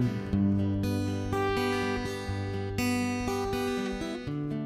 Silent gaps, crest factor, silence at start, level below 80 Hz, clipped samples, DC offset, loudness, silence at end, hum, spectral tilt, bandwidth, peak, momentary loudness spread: none; 12 dB; 0 s; -46 dBFS; under 0.1%; under 0.1%; -30 LUFS; 0 s; none; -6 dB/octave; 15 kHz; -16 dBFS; 6 LU